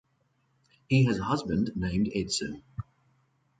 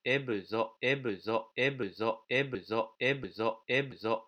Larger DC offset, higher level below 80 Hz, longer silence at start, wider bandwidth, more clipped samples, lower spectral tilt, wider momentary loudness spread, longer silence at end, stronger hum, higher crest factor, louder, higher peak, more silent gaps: neither; first, -50 dBFS vs -72 dBFS; first, 0.9 s vs 0.05 s; about the same, 9.4 kHz vs 9.2 kHz; neither; about the same, -5.5 dB/octave vs -6 dB/octave; first, 18 LU vs 4 LU; first, 0.8 s vs 0.05 s; neither; about the same, 20 dB vs 18 dB; first, -28 LUFS vs -33 LUFS; first, -12 dBFS vs -16 dBFS; neither